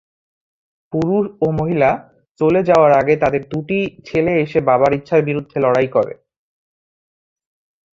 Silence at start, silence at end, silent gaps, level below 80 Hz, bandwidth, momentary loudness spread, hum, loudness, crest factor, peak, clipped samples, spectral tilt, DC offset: 0.95 s; 1.8 s; 2.31-2.35 s; -50 dBFS; 7.6 kHz; 9 LU; none; -16 LUFS; 16 dB; -2 dBFS; under 0.1%; -8 dB/octave; under 0.1%